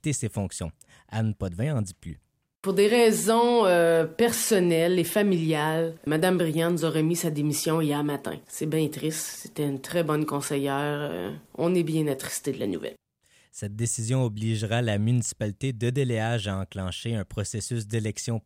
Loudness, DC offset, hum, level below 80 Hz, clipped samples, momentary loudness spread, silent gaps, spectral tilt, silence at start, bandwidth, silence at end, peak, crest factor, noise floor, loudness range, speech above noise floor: -26 LUFS; under 0.1%; none; -58 dBFS; under 0.1%; 12 LU; none; -5 dB/octave; 0.05 s; 16 kHz; 0.05 s; -10 dBFS; 16 dB; -64 dBFS; 7 LU; 38 dB